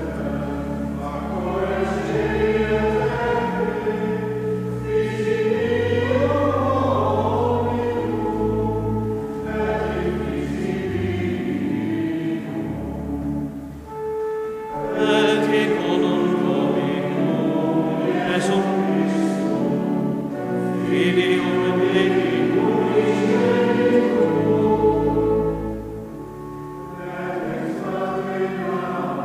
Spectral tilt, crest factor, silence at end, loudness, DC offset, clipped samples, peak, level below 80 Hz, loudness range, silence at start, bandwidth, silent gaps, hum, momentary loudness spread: -7 dB/octave; 16 dB; 0 s; -21 LUFS; under 0.1%; under 0.1%; -4 dBFS; -40 dBFS; 7 LU; 0 s; 15 kHz; none; none; 9 LU